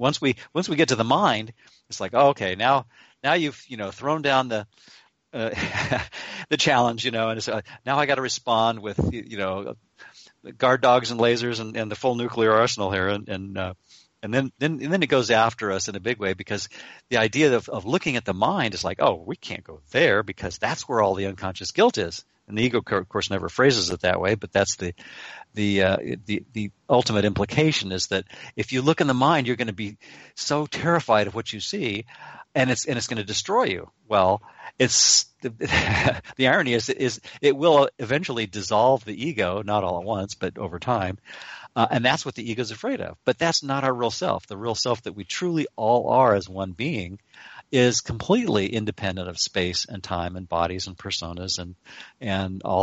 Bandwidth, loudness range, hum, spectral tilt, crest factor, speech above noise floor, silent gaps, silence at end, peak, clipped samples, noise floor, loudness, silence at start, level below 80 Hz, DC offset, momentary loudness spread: 8.2 kHz; 4 LU; none; -4 dB/octave; 18 dB; 26 dB; none; 0 s; -6 dBFS; under 0.1%; -50 dBFS; -23 LUFS; 0 s; -52 dBFS; under 0.1%; 12 LU